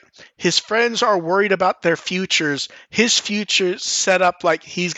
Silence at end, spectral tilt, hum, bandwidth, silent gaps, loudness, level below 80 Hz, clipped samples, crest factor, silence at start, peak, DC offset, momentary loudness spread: 0 s; -2.5 dB/octave; none; 8.6 kHz; none; -18 LUFS; -68 dBFS; under 0.1%; 18 dB; 0.2 s; -2 dBFS; under 0.1%; 6 LU